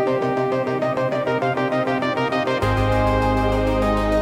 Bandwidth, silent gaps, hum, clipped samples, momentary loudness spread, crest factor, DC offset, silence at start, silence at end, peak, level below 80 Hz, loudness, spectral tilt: 15.5 kHz; none; none; under 0.1%; 3 LU; 12 dB; under 0.1%; 0 s; 0 s; -6 dBFS; -30 dBFS; -20 LUFS; -7 dB/octave